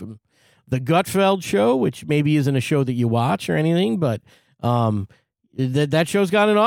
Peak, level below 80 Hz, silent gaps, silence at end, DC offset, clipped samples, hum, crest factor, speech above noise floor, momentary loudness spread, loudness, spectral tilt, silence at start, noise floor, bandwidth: -6 dBFS; -58 dBFS; none; 0 s; under 0.1%; under 0.1%; none; 14 dB; 40 dB; 10 LU; -20 LUFS; -6.5 dB/octave; 0 s; -59 dBFS; 17.5 kHz